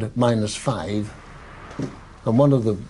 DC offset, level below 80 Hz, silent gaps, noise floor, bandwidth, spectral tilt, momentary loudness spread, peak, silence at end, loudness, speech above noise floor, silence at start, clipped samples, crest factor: under 0.1%; -46 dBFS; none; -40 dBFS; 11.5 kHz; -7 dB/octave; 22 LU; -6 dBFS; 0 s; -22 LUFS; 20 dB; 0 s; under 0.1%; 16 dB